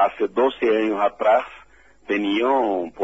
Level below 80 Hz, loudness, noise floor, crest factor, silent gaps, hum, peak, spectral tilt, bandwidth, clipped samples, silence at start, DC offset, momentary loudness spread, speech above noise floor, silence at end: -60 dBFS; -21 LUFS; -52 dBFS; 16 dB; none; none; -6 dBFS; -6 dB/octave; 8 kHz; under 0.1%; 0 s; 0.2%; 5 LU; 31 dB; 0 s